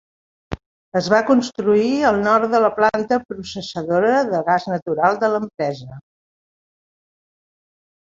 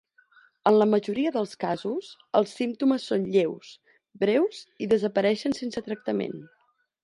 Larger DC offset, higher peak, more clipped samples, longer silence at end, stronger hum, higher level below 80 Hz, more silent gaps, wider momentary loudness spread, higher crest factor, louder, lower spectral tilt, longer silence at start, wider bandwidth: neither; first, 0 dBFS vs -6 dBFS; neither; first, 2.15 s vs 0.6 s; neither; first, -52 dBFS vs -70 dBFS; first, 0.66-0.92 s, 4.82-4.86 s vs none; first, 16 LU vs 10 LU; about the same, 20 dB vs 20 dB; first, -18 LUFS vs -26 LUFS; about the same, -5.5 dB/octave vs -6 dB/octave; second, 0.5 s vs 0.65 s; second, 7.8 kHz vs 11.5 kHz